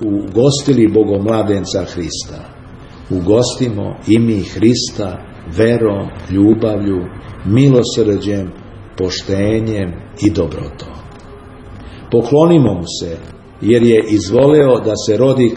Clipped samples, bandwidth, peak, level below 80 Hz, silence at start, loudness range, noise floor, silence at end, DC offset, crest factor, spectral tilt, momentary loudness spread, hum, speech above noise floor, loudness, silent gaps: under 0.1%; 10.5 kHz; 0 dBFS; -38 dBFS; 0 s; 6 LU; -34 dBFS; 0 s; under 0.1%; 14 dB; -6.5 dB/octave; 18 LU; none; 21 dB; -14 LUFS; none